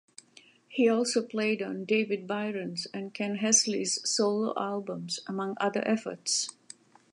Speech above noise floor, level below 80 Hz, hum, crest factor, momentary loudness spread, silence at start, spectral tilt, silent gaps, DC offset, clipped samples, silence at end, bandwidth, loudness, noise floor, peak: 29 dB; -82 dBFS; none; 20 dB; 12 LU; 0.7 s; -2.5 dB/octave; none; under 0.1%; under 0.1%; 0.6 s; 11.5 kHz; -29 LUFS; -59 dBFS; -10 dBFS